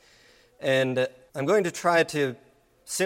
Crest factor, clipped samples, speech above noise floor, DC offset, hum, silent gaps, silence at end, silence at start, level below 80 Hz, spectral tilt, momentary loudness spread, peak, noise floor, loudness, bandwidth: 18 dB; under 0.1%; 33 dB; under 0.1%; none; none; 0 s; 0.6 s; -70 dBFS; -4 dB/octave; 9 LU; -10 dBFS; -58 dBFS; -25 LUFS; 16 kHz